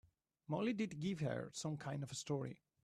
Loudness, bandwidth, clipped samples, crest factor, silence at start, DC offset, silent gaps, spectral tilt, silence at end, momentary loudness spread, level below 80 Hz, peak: -43 LUFS; 13 kHz; under 0.1%; 16 dB; 0.5 s; under 0.1%; none; -5.5 dB/octave; 0.3 s; 5 LU; -76 dBFS; -28 dBFS